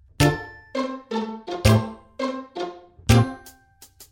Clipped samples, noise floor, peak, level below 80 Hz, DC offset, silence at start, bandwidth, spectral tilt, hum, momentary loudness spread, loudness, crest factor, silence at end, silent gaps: under 0.1%; -52 dBFS; -2 dBFS; -36 dBFS; under 0.1%; 0.2 s; 17 kHz; -6 dB/octave; none; 14 LU; -24 LUFS; 22 dB; 0.1 s; none